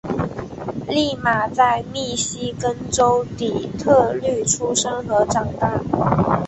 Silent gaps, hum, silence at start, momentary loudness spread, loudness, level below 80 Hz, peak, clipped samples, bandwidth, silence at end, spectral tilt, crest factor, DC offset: none; none; 0.05 s; 8 LU; -20 LUFS; -44 dBFS; -2 dBFS; under 0.1%; 8.6 kHz; 0 s; -4 dB/octave; 18 dB; under 0.1%